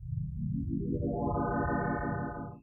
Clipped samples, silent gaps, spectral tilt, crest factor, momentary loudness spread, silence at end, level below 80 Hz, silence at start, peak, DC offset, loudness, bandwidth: under 0.1%; none; -13.5 dB/octave; 14 dB; 5 LU; 0.05 s; -44 dBFS; 0 s; -20 dBFS; under 0.1%; -34 LUFS; 2.4 kHz